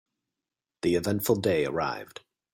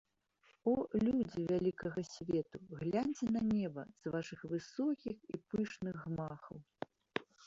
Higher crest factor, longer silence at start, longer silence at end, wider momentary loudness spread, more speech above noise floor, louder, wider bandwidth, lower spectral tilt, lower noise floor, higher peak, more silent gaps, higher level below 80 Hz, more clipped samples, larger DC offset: about the same, 18 dB vs 22 dB; first, 0.85 s vs 0.65 s; first, 0.5 s vs 0 s; about the same, 11 LU vs 12 LU; first, 62 dB vs 35 dB; first, -27 LUFS vs -39 LUFS; first, 16.5 kHz vs 7.8 kHz; second, -5.5 dB/octave vs -7 dB/octave; first, -89 dBFS vs -73 dBFS; first, -10 dBFS vs -16 dBFS; neither; first, -60 dBFS vs -68 dBFS; neither; neither